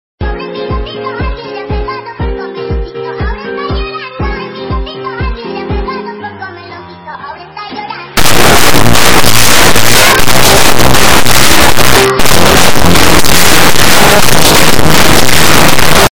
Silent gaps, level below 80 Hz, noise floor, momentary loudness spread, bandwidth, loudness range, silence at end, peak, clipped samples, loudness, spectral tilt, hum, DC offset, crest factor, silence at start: none; -20 dBFS; -27 dBFS; 16 LU; over 20 kHz; 13 LU; 0 s; 0 dBFS; 10%; -7 LUFS; -3 dB/octave; none; under 0.1%; 8 dB; 0.15 s